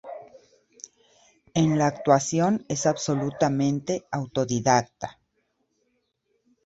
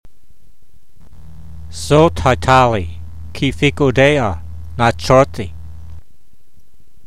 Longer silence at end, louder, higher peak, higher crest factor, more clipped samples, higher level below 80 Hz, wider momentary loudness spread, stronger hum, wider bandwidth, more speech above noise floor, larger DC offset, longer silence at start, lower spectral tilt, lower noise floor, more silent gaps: first, 1.55 s vs 1.05 s; second, -24 LUFS vs -14 LUFS; second, -4 dBFS vs 0 dBFS; about the same, 22 dB vs 18 dB; neither; second, -62 dBFS vs -34 dBFS; about the same, 21 LU vs 21 LU; neither; second, 8 kHz vs 14.5 kHz; first, 50 dB vs 43 dB; second, under 0.1% vs 3%; second, 0.05 s vs 1.4 s; about the same, -5.5 dB/octave vs -6 dB/octave; first, -73 dBFS vs -56 dBFS; neither